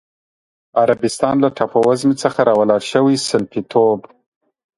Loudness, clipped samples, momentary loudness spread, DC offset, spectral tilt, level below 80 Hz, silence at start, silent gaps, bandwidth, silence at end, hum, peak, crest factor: -16 LUFS; under 0.1%; 5 LU; under 0.1%; -5.5 dB/octave; -58 dBFS; 0.75 s; none; 11.5 kHz; 0.8 s; none; 0 dBFS; 16 dB